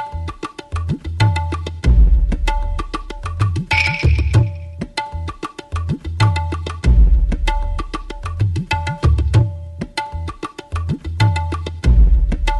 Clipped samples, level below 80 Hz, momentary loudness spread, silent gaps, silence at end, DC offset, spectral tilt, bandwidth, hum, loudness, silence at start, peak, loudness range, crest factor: under 0.1%; -18 dBFS; 13 LU; none; 0 s; under 0.1%; -6 dB/octave; 11 kHz; none; -19 LUFS; 0 s; -4 dBFS; 3 LU; 12 dB